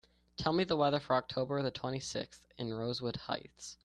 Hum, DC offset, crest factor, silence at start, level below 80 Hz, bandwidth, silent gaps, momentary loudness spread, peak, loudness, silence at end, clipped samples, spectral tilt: none; under 0.1%; 20 dB; 0.4 s; -64 dBFS; 12 kHz; none; 12 LU; -16 dBFS; -35 LUFS; 0.1 s; under 0.1%; -5 dB/octave